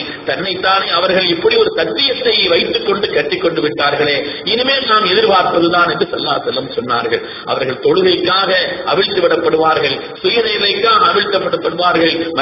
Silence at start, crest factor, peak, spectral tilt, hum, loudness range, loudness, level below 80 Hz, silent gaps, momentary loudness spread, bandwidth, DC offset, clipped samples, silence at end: 0 s; 14 dB; 0 dBFS; -9 dB/octave; none; 2 LU; -13 LUFS; -50 dBFS; none; 7 LU; 5.8 kHz; under 0.1%; under 0.1%; 0 s